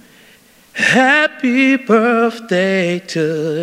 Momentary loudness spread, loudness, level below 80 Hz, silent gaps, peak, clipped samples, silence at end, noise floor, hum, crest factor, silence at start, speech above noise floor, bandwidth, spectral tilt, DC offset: 8 LU; -14 LUFS; -66 dBFS; none; 0 dBFS; under 0.1%; 0 s; -47 dBFS; none; 16 dB; 0.75 s; 33 dB; 14.5 kHz; -5 dB/octave; under 0.1%